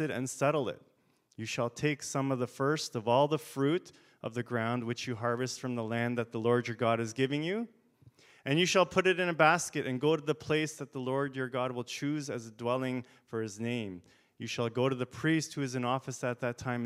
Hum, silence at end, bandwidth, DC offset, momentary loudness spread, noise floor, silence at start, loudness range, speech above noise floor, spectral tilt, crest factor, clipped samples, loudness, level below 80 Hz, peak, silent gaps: none; 0 s; 16 kHz; under 0.1%; 12 LU; -70 dBFS; 0 s; 6 LU; 38 dB; -5 dB/octave; 24 dB; under 0.1%; -32 LUFS; -74 dBFS; -10 dBFS; none